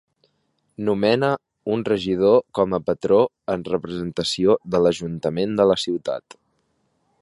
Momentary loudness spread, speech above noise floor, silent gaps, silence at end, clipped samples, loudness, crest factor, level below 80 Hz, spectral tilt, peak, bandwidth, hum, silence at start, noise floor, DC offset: 9 LU; 49 dB; none; 1 s; under 0.1%; -21 LUFS; 18 dB; -54 dBFS; -6 dB/octave; -4 dBFS; 11.5 kHz; none; 0.8 s; -69 dBFS; under 0.1%